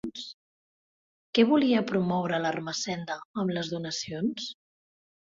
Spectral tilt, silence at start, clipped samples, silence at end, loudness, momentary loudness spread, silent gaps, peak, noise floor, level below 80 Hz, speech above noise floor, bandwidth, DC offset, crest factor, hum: -5 dB/octave; 0.05 s; under 0.1%; 0.7 s; -28 LUFS; 15 LU; 0.34-1.33 s, 3.25-3.34 s; -8 dBFS; under -90 dBFS; -68 dBFS; over 63 dB; 7.6 kHz; under 0.1%; 22 dB; none